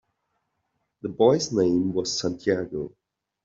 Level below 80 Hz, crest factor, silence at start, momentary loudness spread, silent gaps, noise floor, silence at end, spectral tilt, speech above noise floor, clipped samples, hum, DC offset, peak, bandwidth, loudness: -62 dBFS; 20 dB; 1.05 s; 15 LU; none; -77 dBFS; 0.55 s; -5 dB/octave; 53 dB; under 0.1%; none; under 0.1%; -6 dBFS; 7.8 kHz; -24 LUFS